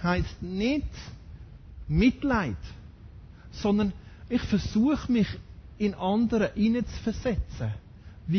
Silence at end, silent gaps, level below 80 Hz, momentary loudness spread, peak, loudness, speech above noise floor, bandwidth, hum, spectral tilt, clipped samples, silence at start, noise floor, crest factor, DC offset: 0 s; none; -40 dBFS; 21 LU; -12 dBFS; -28 LUFS; 20 dB; 6.6 kHz; none; -7 dB/octave; under 0.1%; 0 s; -47 dBFS; 16 dB; under 0.1%